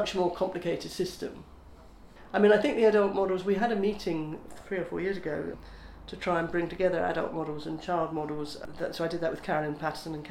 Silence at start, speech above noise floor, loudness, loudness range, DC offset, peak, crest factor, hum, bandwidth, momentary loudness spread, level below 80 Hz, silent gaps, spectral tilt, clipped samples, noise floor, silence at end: 0 s; 21 dB; -30 LUFS; 5 LU; under 0.1%; -12 dBFS; 18 dB; none; 13.5 kHz; 16 LU; -54 dBFS; none; -6 dB/octave; under 0.1%; -50 dBFS; 0 s